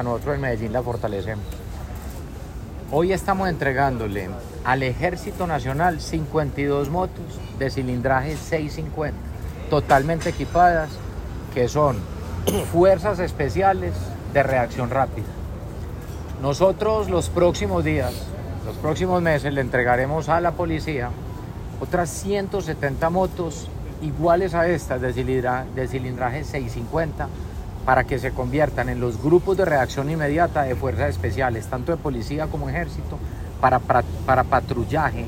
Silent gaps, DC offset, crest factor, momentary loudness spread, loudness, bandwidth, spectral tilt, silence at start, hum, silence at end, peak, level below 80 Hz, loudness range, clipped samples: none; under 0.1%; 18 dB; 14 LU; -23 LUFS; 16 kHz; -6.5 dB/octave; 0 s; none; 0 s; -4 dBFS; -36 dBFS; 4 LU; under 0.1%